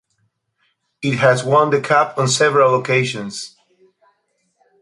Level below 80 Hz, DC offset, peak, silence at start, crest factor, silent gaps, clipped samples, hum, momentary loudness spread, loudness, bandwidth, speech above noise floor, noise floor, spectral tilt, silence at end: -62 dBFS; under 0.1%; -2 dBFS; 1 s; 16 dB; none; under 0.1%; none; 14 LU; -16 LUFS; 11.5 kHz; 51 dB; -67 dBFS; -4.5 dB/octave; 1.35 s